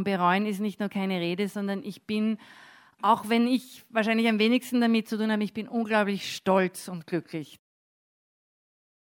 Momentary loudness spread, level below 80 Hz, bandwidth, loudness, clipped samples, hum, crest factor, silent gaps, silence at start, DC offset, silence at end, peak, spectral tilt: 9 LU; -78 dBFS; 17.5 kHz; -27 LUFS; under 0.1%; none; 18 dB; none; 0 s; under 0.1%; 1.65 s; -8 dBFS; -5.5 dB/octave